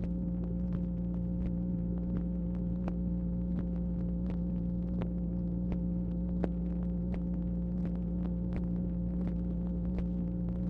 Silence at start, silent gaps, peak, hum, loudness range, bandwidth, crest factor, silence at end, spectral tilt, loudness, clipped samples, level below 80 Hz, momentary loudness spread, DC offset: 0 s; none; -16 dBFS; none; 0 LU; 3 kHz; 18 dB; 0 s; -12 dB/octave; -35 LUFS; under 0.1%; -40 dBFS; 1 LU; under 0.1%